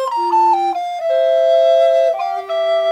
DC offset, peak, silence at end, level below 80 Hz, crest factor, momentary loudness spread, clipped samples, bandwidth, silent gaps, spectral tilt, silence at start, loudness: under 0.1%; -6 dBFS; 0 s; -68 dBFS; 10 dB; 8 LU; under 0.1%; 9.8 kHz; none; -2 dB/octave; 0 s; -15 LUFS